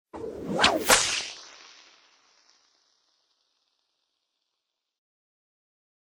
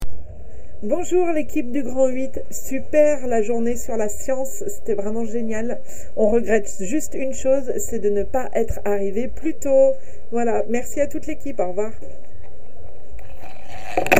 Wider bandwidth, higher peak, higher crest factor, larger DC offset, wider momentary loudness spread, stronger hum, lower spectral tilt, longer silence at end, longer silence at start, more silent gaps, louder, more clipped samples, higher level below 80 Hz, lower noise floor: first, over 20 kHz vs 16 kHz; second, -4 dBFS vs 0 dBFS; first, 28 dB vs 22 dB; second, under 0.1% vs 10%; about the same, 22 LU vs 20 LU; neither; second, -1 dB/octave vs -5 dB/octave; first, 4.55 s vs 0 s; first, 0.15 s vs 0 s; neither; about the same, -22 LUFS vs -23 LUFS; neither; second, -58 dBFS vs -42 dBFS; first, -83 dBFS vs -44 dBFS